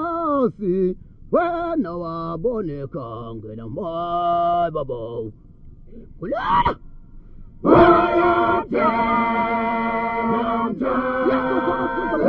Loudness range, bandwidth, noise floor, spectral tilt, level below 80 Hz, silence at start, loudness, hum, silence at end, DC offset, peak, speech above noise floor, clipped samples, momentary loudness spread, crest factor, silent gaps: 8 LU; 5.4 kHz; -41 dBFS; -9 dB/octave; -42 dBFS; 0 s; -20 LUFS; none; 0 s; under 0.1%; 0 dBFS; 21 dB; under 0.1%; 15 LU; 20 dB; none